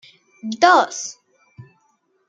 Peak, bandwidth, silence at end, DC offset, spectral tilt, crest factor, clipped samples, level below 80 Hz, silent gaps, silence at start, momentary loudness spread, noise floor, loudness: -2 dBFS; 9 kHz; 0.65 s; under 0.1%; -2.5 dB/octave; 20 dB; under 0.1%; -74 dBFS; none; 0.45 s; 19 LU; -65 dBFS; -16 LUFS